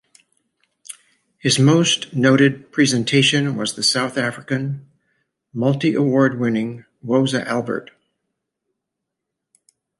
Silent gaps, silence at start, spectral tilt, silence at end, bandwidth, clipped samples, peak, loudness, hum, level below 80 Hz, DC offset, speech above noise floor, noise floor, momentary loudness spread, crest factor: none; 0.9 s; -4.5 dB/octave; 2.15 s; 11.5 kHz; under 0.1%; -2 dBFS; -18 LUFS; none; -64 dBFS; under 0.1%; 63 dB; -81 dBFS; 16 LU; 18 dB